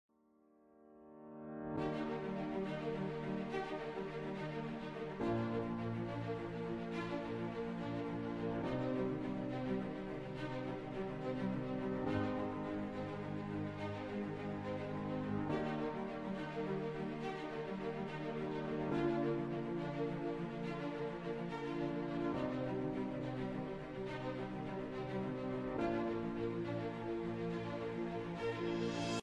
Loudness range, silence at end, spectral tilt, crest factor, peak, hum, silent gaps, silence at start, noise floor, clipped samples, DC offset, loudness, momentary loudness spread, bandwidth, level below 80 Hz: 2 LU; 0 s; -7.5 dB/octave; 16 dB; -24 dBFS; none; none; 0.75 s; -71 dBFS; under 0.1%; under 0.1%; -41 LUFS; 5 LU; 11 kHz; -62 dBFS